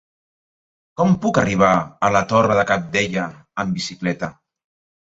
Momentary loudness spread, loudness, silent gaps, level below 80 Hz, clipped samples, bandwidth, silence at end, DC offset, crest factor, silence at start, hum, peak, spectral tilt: 11 LU; -19 LUFS; none; -50 dBFS; under 0.1%; 8 kHz; 0.7 s; under 0.1%; 18 dB; 1 s; none; -2 dBFS; -5.5 dB/octave